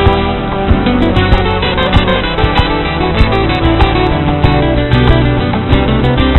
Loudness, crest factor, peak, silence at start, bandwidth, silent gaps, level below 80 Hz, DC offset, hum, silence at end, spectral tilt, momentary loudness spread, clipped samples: -11 LUFS; 10 dB; 0 dBFS; 0 s; 5.2 kHz; none; -16 dBFS; 0.4%; none; 0 s; -8.5 dB/octave; 3 LU; under 0.1%